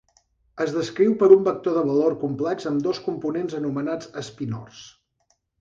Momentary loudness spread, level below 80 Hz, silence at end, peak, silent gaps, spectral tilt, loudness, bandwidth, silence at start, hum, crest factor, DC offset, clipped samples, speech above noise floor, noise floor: 16 LU; -64 dBFS; 0.7 s; -2 dBFS; none; -7 dB/octave; -22 LUFS; 7.6 kHz; 0.55 s; none; 22 dB; under 0.1%; under 0.1%; 47 dB; -69 dBFS